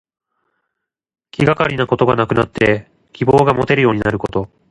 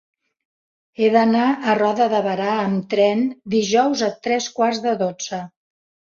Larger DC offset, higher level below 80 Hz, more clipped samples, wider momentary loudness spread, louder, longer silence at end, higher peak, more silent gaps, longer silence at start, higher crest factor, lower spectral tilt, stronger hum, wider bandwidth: neither; first, -42 dBFS vs -66 dBFS; neither; about the same, 9 LU vs 7 LU; first, -15 LUFS vs -19 LUFS; second, 0.25 s vs 0.65 s; first, 0 dBFS vs -4 dBFS; neither; first, 1.4 s vs 1 s; about the same, 16 dB vs 16 dB; first, -7.5 dB/octave vs -4.5 dB/octave; neither; first, 11 kHz vs 7.4 kHz